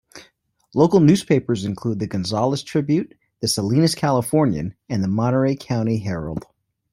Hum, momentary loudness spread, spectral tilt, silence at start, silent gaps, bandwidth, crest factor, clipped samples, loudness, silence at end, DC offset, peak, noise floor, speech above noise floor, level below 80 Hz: none; 11 LU; -6 dB/octave; 0.15 s; none; 16 kHz; 18 dB; under 0.1%; -20 LUFS; 0.55 s; under 0.1%; -2 dBFS; -59 dBFS; 39 dB; -52 dBFS